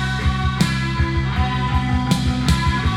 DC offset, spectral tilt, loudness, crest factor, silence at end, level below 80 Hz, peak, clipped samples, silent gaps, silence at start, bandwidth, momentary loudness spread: under 0.1%; -5.5 dB/octave; -20 LUFS; 16 dB; 0 s; -24 dBFS; -4 dBFS; under 0.1%; none; 0 s; 15.5 kHz; 2 LU